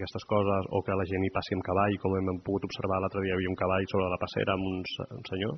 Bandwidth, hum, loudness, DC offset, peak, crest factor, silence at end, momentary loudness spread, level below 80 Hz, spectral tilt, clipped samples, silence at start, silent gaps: 6.4 kHz; none; -30 LUFS; under 0.1%; -12 dBFS; 18 dB; 0 s; 6 LU; -58 dBFS; -5 dB/octave; under 0.1%; 0 s; none